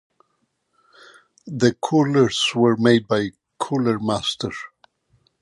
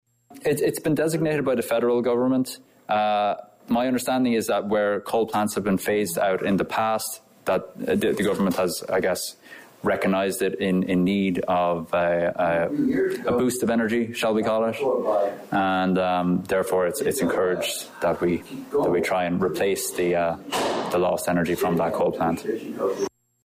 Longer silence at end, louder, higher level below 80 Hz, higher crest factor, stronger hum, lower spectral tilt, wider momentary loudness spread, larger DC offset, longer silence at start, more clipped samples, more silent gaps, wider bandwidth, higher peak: first, 0.75 s vs 0.35 s; first, -20 LUFS vs -24 LUFS; about the same, -58 dBFS vs -56 dBFS; first, 18 dB vs 10 dB; neither; about the same, -5.5 dB/octave vs -5 dB/octave; first, 14 LU vs 5 LU; neither; first, 1.45 s vs 0.3 s; neither; neither; second, 11.5 kHz vs 16 kHz; first, -4 dBFS vs -14 dBFS